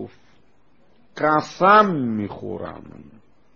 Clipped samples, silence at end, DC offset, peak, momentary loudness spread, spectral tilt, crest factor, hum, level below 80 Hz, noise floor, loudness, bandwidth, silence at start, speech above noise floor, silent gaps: under 0.1%; 0.55 s; 0.3%; -2 dBFS; 22 LU; -4.5 dB/octave; 20 dB; none; -60 dBFS; -60 dBFS; -19 LUFS; 7.2 kHz; 0 s; 41 dB; none